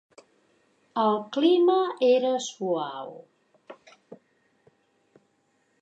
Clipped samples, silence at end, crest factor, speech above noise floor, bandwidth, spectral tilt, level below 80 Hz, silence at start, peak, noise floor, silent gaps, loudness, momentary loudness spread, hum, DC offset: under 0.1%; 1.65 s; 18 dB; 46 dB; 8.2 kHz; -4.5 dB/octave; -86 dBFS; 0.95 s; -10 dBFS; -70 dBFS; none; -24 LUFS; 14 LU; none; under 0.1%